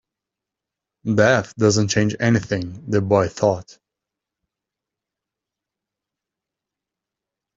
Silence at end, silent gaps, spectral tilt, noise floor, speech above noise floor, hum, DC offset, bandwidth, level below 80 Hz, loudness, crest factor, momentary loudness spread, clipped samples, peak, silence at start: 3.95 s; none; -5.5 dB/octave; -86 dBFS; 67 dB; none; under 0.1%; 7.8 kHz; -56 dBFS; -19 LUFS; 22 dB; 10 LU; under 0.1%; -2 dBFS; 1.05 s